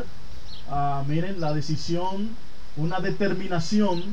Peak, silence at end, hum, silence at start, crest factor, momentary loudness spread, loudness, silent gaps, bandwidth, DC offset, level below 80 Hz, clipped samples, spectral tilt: -10 dBFS; 0 s; none; 0 s; 14 dB; 18 LU; -27 LUFS; none; 9.4 kHz; 7%; -46 dBFS; under 0.1%; -6.5 dB/octave